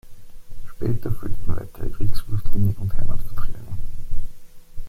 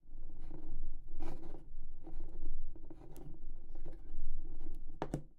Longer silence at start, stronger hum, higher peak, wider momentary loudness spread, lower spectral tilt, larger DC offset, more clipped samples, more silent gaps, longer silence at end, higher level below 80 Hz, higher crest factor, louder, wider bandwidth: about the same, 0.05 s vs 0.05 s; neither; first, -4 dBFS vs -20 dBFS; first, 19 LU vs 7 LU; about the same, -8 dB/octave vs -7.5 dB/octave; neither; neither; neither; second, 0 s vs 0.15 s; first, -26 dBFS vs -38 dBFS; about the same, 12 dB vs 12 dB; first, -29 LUFS vs -50 LUFS; first, 4.6 kHz vs 1.8 kHz